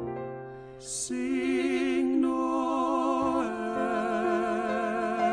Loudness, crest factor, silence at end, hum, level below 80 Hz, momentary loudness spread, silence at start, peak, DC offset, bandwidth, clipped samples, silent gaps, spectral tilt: -28 LUFS; 12 dB; 0 s; none; -60 dBFS; 10 LU; 0 s; -16 dBFS; under 0.1%; 10.5 kHz; under 0.1%; none; -4.5 dB/octave